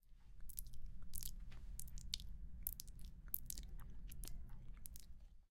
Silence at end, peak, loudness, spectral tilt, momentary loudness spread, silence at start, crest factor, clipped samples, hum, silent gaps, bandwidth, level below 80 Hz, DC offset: 0.05 s; -16 dBFS; -52 LUFS; -2 dB/octave; 12 LU; 0.05 s; 32 dB; under 0.1%; none; none; 17 kHz; -54 dBFS; under 0.1%